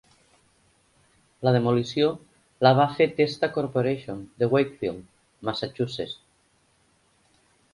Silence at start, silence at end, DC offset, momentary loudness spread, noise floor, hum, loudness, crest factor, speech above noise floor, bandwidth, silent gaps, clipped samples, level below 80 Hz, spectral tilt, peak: 1.4 s; 1.6 s; under 0.1%; 14 LU; -65 dBFS; none; -25 LUFS; 24 dB; 41 dB; 11.5 kHz; none; under 0.1%; -62 dBFS; -7 dB/octave; -4 dBFS